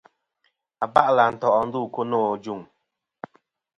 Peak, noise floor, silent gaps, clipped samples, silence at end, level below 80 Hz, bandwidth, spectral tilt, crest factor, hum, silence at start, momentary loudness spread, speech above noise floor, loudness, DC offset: 0 dBFS; -78 dBFS; none; under 0.1%; 1.15 s; -64 dBFS; 10 kHz; -6.5 dB/octave; 24 dB; none; 0.8 s; 24 LU; 57 dB; -22 LUFS; under 0.1%